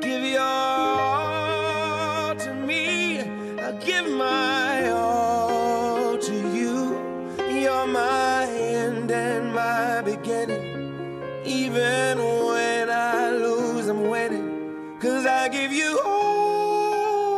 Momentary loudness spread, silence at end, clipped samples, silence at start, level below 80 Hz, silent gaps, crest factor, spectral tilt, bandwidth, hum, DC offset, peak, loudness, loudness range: 7 LU; 0 s; under 0.1%; 0 s; -62 dBFS; none; 14 dB; -4 dB/octave; 15 kHz; none; under 0.1%; -10 dBFS; -24 LUFS; 2 LU